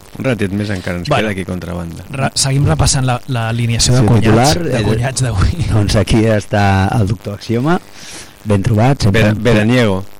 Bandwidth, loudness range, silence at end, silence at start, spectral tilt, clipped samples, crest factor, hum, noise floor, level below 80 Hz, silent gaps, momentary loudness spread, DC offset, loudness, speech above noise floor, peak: 16 kHz; 3 LU; 0 s; 0.15 s; -5.5 dB/octave; under 0.1%; 12 dB; none; -33 dBFS; -28 dBFS; none; 11 LU; under 0.1%; -14 LUFS; 20 dB; -2 dBFS